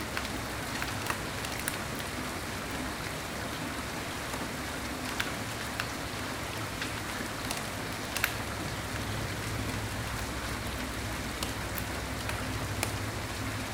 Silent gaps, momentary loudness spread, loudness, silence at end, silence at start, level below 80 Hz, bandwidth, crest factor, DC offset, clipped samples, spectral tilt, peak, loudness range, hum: none; 3 LU; -34 LUFS; 0 s; 0 s; -46 dBFS; 18 kHz; 26 dB; under 0.1%; under 0.1%; -3.5 dB/octave; -10 dBFS; 1 LU; none